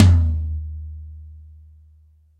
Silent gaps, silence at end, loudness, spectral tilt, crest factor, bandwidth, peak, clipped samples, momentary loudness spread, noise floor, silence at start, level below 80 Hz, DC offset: none; 1 s; -22 LUFS; -7.5 dB/octave; 18 dB; 7.8 kHz; -2 dBFS; under 0.1%; 25 LU; -53 dBFS; 0 s; -28 dBFS; under 0.1%